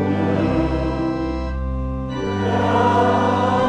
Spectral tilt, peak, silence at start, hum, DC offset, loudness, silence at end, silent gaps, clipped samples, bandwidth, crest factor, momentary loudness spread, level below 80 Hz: -7.5 dB/octave; -4 dBFS; 0 s; none; under 0.1%; -20 LUFS; 0 s; none; under 0.1%; 9.6 kHz; 14 dB; 9 LU; -30 dBFS